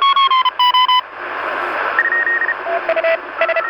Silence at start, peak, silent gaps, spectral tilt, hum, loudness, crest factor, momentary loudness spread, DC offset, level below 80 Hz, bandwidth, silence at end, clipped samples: 0 s; 0 dBFS; none; -2 dB/octave; none; -15 LUFS; 14 dB; 8 LU; under 0.1%; -64 dBFS; 17.5 kHz; 0 s; under 0.1%